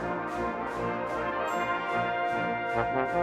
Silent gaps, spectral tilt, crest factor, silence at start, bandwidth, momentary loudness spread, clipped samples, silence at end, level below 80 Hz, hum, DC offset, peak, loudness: none; -6 dB/octave; 16 dB; 0 s; 13.5 kHz; 4 LU; under 0.1%; 0 s; -54 dBFS; none; under 0.1%; -14 dBFS; -30 LUFS